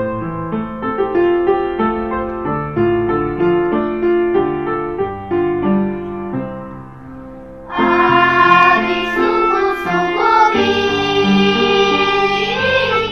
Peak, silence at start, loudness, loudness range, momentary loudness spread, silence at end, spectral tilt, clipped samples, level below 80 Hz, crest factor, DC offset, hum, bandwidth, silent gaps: 0 dBFS; 0 s; -15 LUFS; 6 LU; 13 LU; 0 s; -6 dB/octave; under 0.1%; -40 dBFS; 16 dB; 0.5%; none; 6.8 kHz; none